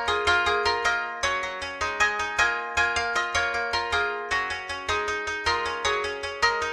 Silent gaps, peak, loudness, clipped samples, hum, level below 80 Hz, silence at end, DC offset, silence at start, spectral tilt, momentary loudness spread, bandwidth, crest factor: none; -8 dBFS; -25 LUFS; under 0.1%; none; -48 dBFS; 0 s; under 0.1%; 0 s; -1.5 dB/octave; 6 LU; 13.5 kHz; 18 dB